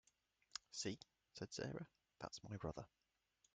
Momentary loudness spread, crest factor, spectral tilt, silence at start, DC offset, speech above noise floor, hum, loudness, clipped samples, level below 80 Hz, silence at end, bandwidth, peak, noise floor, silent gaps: 11 LU; 24 dB; -4 dB/octave; 0.55 s; under 0.1%; 33 dB; none; -52 LUFS; under 0.1%; -74 dBFS; 0.65 s; 9.4 kHz; -28 dBFS; -83 dBFS; none